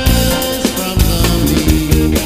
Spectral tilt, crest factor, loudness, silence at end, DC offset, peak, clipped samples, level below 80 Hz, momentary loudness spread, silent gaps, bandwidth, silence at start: -4.5 dB/octave; 12 dB; -13 LUFS; 0 s; under 0.1%; 0 dBFS; under 0.1%; -16 dBFS; 3 LU; none; 16 kHz; 0 s